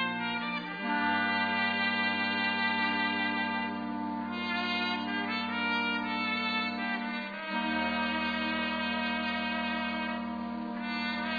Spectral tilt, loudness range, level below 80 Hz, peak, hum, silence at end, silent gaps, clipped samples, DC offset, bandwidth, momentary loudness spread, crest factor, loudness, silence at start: -6 dB/octave; 3 LU; -64 dBFS; -16 dBFS; none; 0 s; none; under 0.1%; under 0.1%; 5 kHz; 7 LU; 16 dB; -31 LUFS; 0 s